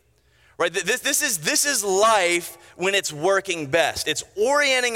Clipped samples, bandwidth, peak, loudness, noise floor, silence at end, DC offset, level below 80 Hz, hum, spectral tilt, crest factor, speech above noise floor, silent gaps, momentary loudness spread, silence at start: under 0.1%; 17 kHz; -6 dBFS; -21 LUFS; -59 dBFS; 0 s; under 0.1%; -60 dBFS; none; -1.5 dB/octave; 16 dB; 38 dB; none; 7 LU; 0.6 s